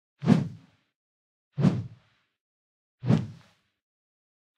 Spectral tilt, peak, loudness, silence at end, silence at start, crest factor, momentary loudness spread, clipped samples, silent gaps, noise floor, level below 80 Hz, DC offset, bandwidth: -8.5 dB/octave; -6 dBFS; -27 LUFS; 1.25 s; 0.2 s; 24 dB; 17 LU; under 0.1%; 0.96-1.51 s, 2.41-2.98 s; -59 dBFS; -64 dBFS; under 0.1%; 9.4 kHz